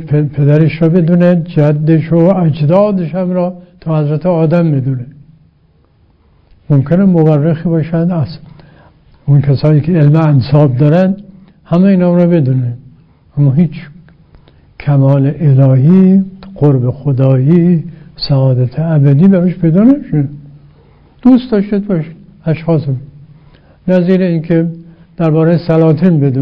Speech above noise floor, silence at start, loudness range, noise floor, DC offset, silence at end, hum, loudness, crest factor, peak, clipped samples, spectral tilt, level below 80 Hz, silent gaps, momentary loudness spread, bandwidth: 41 dB; 0 s; 5 LU; -50 dBFS; under 0.1%; 0 s; none; -11 LUFS; 10 dB; 0 dBFS; 0.7%; -11 dB/octave; -42 dBFS; none; 11 LU; 5.4 kHz